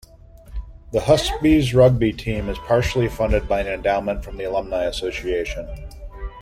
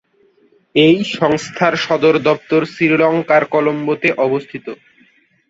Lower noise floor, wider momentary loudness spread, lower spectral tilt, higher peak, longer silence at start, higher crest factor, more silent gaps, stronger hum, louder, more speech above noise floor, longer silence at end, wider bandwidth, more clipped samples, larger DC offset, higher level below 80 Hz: second, -44 dBFS vs -55 dBFS; first, 21 LU vs 7 LU; about the same, -6 dB/octave vs -5.5 dB/octave; about the same, -2 dBFS vs -2 dBFS; second, 0.45 s vs 0.75 s; about the same, 18 dB vs 14 dB; neither; neither; second, -20 LUFS vs -15 LUFS; second, 24 dB vs 40 dB; second, 0 s vs 0.75 s; first, 15.5 kHz vs 8 kHz; neither; neither; first, -32 dBFS vs -58 dBFS